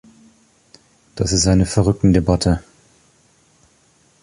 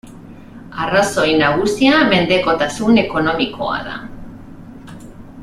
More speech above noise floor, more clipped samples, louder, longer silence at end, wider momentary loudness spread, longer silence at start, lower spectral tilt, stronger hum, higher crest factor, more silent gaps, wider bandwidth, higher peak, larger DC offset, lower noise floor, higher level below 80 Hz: first, 41 dB vs 22 dB; neither; about the same, -17 LUFS vs -15 LUFS; first, 1.65 s vs 0 s; second, 9 LU vs 24 LU; first, 1.15 s vs 0.05 s; about the same, -5.5 dB/octave vs -4.5 dB/octave; neither; about the same, 18 dB vs 16 dB; neither; second, 11.5 kHz vs 14.5 kHz; about the same, -2 dBFS vs 0 dBFS; neither; first, -56 dBFS vs -37 dBFS; first, -32 dBFS vs -42 dBFS